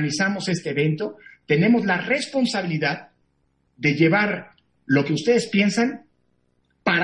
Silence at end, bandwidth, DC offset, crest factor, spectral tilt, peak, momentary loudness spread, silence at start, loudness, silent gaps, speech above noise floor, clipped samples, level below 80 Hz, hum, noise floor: 0 s; 11 kHz; under 0.1%; 18 dB; -5.5 dB/octave; -6 dBFS; 9 LU; 0 s; -21 LUFS; none; 47 dB; under 0.1%; -66 dBFS; none; -68 dBFS